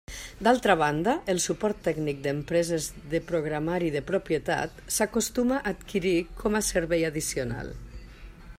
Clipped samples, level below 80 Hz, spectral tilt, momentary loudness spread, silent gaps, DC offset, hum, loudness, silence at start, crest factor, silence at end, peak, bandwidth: under 0.1%; -46 dBFS; -4.5 dB/octave; 8 LU; none; under 0.1%; none; -27 LUFS; 0.1 s; 20 dB; 0 s; -8 dBFS; 16 kHz